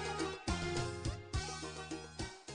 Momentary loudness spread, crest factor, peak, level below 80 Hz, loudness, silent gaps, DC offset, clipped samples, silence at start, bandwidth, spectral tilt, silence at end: 8 LU; 18 dB; -24 dBFS; -50 dBFS; -41 LUFS; none; under 0.1%; under 0.1%; 0 s; 10 kHz; -4.5 dB/octave; 0 s